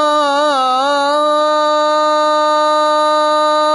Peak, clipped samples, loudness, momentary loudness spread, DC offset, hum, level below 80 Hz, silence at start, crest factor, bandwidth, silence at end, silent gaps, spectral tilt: -4 dBFS; under 0.1%; -13 LUFS; 1 LU; under 0.1%; none; -72 dBFS; 0 s; 8 dB; 11 kHz; 0 s; none; -0.5 dB/octave